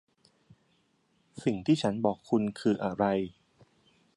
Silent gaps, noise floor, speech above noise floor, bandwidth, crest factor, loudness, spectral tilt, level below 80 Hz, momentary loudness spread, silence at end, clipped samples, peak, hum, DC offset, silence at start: none; -71 dBFS; 43 dB; 11.5 kHz; 20 dB; -30 LUFS; -7 dB/octave; -64 dBFS; 6 LU; 0.85 s; under 0.1%; -12 dBFS; none; under 0.1%; 1.35 s